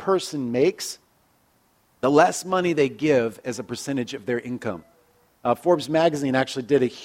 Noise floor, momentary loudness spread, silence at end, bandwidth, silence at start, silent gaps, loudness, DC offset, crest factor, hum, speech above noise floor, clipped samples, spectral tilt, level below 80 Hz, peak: -63 dBFS; 12 LU; 0 s; 16.5 kHz; 0 s; none; -23 LUFS; under 0.1%; 20 dB; none; 41 dB; under 0.1%; -5 dB/octave; -66 dBFS; -4 dBFS